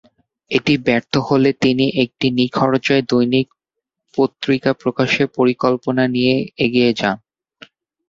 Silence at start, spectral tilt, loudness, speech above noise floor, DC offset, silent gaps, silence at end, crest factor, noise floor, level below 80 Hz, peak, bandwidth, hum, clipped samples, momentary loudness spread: 0.5 s; -6 dB/octave; -17 LUFS; 65 dB; under 0.1%; none; 0.95 s; 16 dB; -81 dBFS; -54 dBFS; -2 dBFS; 7.6 kHz; none; under 0.1%; 5 LU